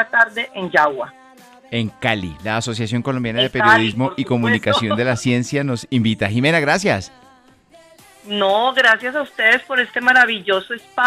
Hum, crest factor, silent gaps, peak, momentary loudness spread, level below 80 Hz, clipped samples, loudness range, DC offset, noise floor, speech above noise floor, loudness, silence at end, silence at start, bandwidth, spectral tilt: none; 16 dB; none; -2 dBFS; 10 LU; -54 dBFS; under 0.1%; 4 LU; under 0.1%; -50 dBFS; 33 dB; -17 LUFS; 0 s; 0 s; 14.5 kHz; -5 dB/octave